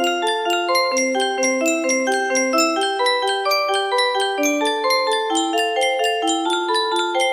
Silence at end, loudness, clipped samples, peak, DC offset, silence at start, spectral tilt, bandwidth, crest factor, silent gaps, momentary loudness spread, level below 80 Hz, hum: 0 s; -19 LUFS; under 0.1%; -4 dBFS; under 0.1%; 0 s; 0 dB/octave; 15.5 kHz; 14 dB; none; 2 LU; -70 dBFS; none